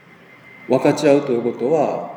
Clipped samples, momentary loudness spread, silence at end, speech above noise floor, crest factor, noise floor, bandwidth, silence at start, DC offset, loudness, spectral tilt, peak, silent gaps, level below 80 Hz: under 0.1%; 6 LU; 0 s; 28 dB; 18 dB; -45 dBFS; 18.5 kHz; 0.6 s; under 0.1%; -18 LUFS; -6.5 dB/octave; -2 dBFS; none; -74 dBFS